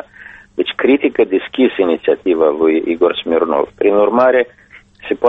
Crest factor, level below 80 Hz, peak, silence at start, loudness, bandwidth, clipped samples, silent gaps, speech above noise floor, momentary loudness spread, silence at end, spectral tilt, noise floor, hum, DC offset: 14 dB; -52 dBFS; 0 dBFS; 0.2 s; -14 LUFS; 4.1 kHz; under 0.1%; none; 25 dB; 10 LU; 0 s; -7 dB/octave; -39 dBFS; none; under 0.1%